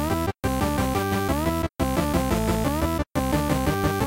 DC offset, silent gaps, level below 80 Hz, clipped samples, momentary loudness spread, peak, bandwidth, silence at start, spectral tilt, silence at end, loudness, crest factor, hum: under 0.1%; none; -32 dBFS; under 0.1%; 3 LU; -10 dBFS; 16 kHz; 0 s; -5.5 dB/octave; 0 s; -24 LUFS; 14 dB; none